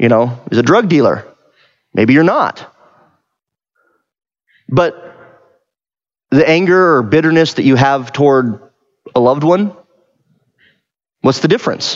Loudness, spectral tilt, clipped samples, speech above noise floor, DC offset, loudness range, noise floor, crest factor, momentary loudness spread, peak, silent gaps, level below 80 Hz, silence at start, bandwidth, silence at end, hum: -12 LUFS; -6.5 dB/octave; under 0.1%; over 79 dB; under 0.1%; 10 LU; under -90 dBFS; 14 dB; 9 LU; 0 dBFS; none; -54 dBFS; 0 s; 7.8 kHz; 0 s; none